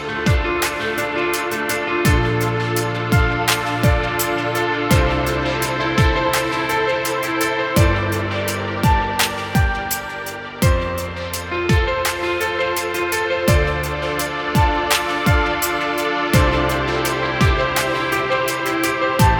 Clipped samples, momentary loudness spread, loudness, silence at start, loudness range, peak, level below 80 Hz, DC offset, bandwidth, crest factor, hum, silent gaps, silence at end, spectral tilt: under 0.1%; 5 LU; -19 LUFS; 0 s; 2 LU; -2 dBFS; -28 dBFS; under 0.1%; over 20 kHz; 18 dB; none; none; 0 s; -4.5 dB/octave